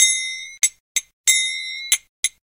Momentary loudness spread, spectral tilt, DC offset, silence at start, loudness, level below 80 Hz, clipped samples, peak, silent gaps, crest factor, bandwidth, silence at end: 9 LU; 6.5 dB/octave; under 0.1%; 0 s; -20 LUFS; -70 dBFS; under 0.1%; 0 dBFS; 0.80-0.95 s, 1.13-1.24 s, 2.09-2.23 s; 22 dB; 16.5 kHz; 0.3 s